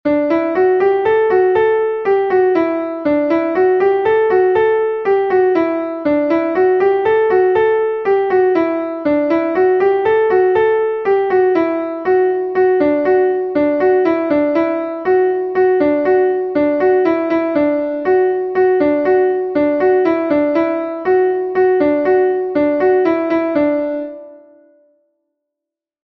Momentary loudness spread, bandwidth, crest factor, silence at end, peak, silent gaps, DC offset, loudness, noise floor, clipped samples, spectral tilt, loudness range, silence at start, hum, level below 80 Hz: 4 LU; 5.4 kHz; 12 dB; 1.65 s; -2 dBFS; none; under 0.1%; -15 LUFS; -84 dBFS; under 0.1%; -8 dB/octave; 0 LU; 0.05 s; none; -54 dBFS